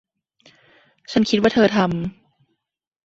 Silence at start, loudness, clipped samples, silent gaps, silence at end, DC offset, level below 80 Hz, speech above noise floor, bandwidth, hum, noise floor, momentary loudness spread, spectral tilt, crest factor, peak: 1.1 s; -19 LUFS; under 0.1%; none; 0.95 s; under 0.1%; -54 dBFS; 62 dB; 7.8 kHz; none; -80 dBFS; 11 LU; -6 dB/octave; 20 dB; -2 dBFS